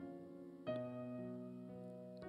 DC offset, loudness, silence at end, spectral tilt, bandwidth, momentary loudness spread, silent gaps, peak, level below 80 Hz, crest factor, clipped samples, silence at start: under 0.1%; -50 LUFS; 0 s; -8.5 dB/octave; 11.5 kHz; 8 LU; none; -32 dBFS; -80 dBFS; 16 dB; under 0.1%; 0 s